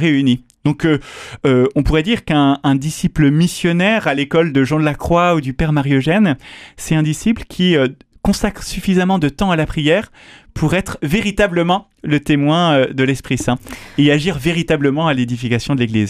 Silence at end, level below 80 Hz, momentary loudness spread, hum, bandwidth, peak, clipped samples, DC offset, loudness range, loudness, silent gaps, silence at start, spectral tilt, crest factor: 0 s; -34 dBFS; 7 LU; none; 15 kHz; -2 dBFS; under 0.1%; under 0.1%; 2 LU; -16 LUFS; none; 0 s; -6 dB/octave; 14 dB